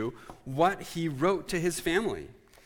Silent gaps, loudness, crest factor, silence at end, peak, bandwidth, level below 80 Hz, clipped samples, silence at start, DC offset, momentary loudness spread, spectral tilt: none; -29 LUFS; 18 dB; 0.35 s; -12 dBFS; 19 kHz; -54 dBFS; under 0.1%; 0 s; under 0.1%; 13 LU; -5 dB/octave